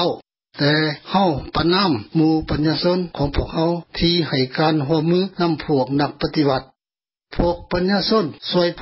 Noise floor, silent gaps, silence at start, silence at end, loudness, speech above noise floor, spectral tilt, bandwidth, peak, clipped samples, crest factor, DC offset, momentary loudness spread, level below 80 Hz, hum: under -90 dBFS; none; 0 s; 0 s; -19 LUFS; over 71 dB; -10 dB/octave; 5.8 kHz; -4 dBFS; under 0.1%; 14 dB; under 0.1%; 5 LU; -36 dBFS; none